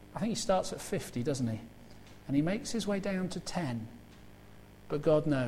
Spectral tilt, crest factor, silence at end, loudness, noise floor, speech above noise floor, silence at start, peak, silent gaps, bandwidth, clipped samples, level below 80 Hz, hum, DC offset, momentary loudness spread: -5.5 dB/octave; 18 dB; 0 s; -33 LUFS; -54 dBFS; 22 dB; 0 s; -16 dBFS; none; 16 kHz; under 0.1%; -56 dBFS; 50 Hz at -55 dBFS; under 0.1%; 20 LU